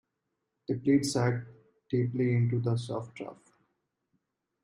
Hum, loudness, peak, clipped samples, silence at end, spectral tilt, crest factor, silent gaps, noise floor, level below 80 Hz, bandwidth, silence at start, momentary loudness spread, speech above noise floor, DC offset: none; -30 LUFS; -14 dBFS; under 0.1%; 1.3 s; -6.5 dB/octave; 18 dB; none; -83 dBFS; -68 dBFS; 12 kHz; 0.7 s; 17 LU; 54 dB; under 0.1%